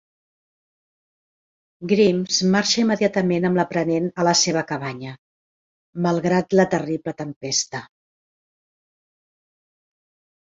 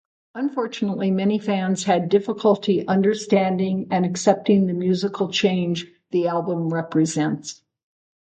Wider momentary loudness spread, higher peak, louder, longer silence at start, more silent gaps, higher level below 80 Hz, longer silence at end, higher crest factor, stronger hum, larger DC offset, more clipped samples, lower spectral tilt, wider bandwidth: first, 13 LU vs 7 LU; about the same, -2 dBFS vs -4 dBFS; about the same, -20 LUFS vs -21 LUFS; first, 1.8 s vs 0.35 s; first, 5.18-5.93 s, 7.36-7.41 s vs none; about the same, -62 dBFS vs -66 dBFS; first, 2.6 s vs 0.85 s; about the same, 20 dB vs 18 dB; neither; neither; neither; second, -4 dB/octave vs -6 dB/octave; second, 7.8 kHz vs 9 kHz